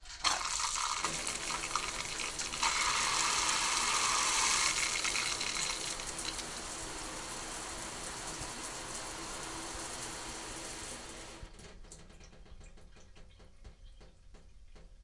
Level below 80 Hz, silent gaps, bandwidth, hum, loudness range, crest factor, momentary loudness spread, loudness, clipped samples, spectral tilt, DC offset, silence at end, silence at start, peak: -54 dBFS; none; 11.5 kHz; none; 16 LU; 24 dB; 14 LU; -34 LUFS; under 0.1%; 0 dB/octave; under 0.1%; 0 s; 0 s; -14 dBFS